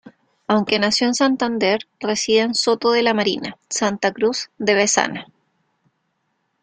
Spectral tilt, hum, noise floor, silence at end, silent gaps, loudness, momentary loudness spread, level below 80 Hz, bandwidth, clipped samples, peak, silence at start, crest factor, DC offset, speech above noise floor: -3 dB/octave; none; -71 dBFS; 1.4 s; none; -19 LUFS; 7 LU; -62 dBFS; 9.6 kHz; under 0.1%; -2 dBFS; 0.05 s; 20 dB; under 0.1%; 52 dB